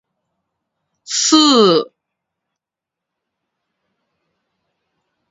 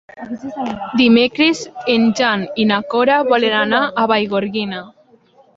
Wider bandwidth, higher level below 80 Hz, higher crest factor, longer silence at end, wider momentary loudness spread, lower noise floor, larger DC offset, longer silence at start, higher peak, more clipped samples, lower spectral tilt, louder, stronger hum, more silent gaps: about the same, 8 kHz vs 7.8 kHz; second, -70 dBFS vs -58 dBFS; about the same, 20 dB vs 16 dB; first, 3.45 s vs 0.65 s; about the same, 12 LU vs 13 LU; first, -85 dBFS vs -51 dBFS; neither; first, 1.1 s vs 0.15 s; about the same, 0 dBFS vs 0 dBFS; neither; second, -3 dB/octave vs -4.5 dB/octave; first, -12 LUFS vs -15 LUFS; neither; neither